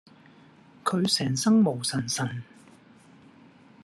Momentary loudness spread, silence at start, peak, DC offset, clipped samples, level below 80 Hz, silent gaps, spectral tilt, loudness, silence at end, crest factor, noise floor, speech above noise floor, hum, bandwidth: 11 LU; 0.85 s; -10 dBFS; under 0.1%; under 0.1%; -72 dBFS; none; -4.5 dB/octave; -25 LUFS; 1.4 s; 18 dB; -54 dBFS; 29 dB; none; 13 kHz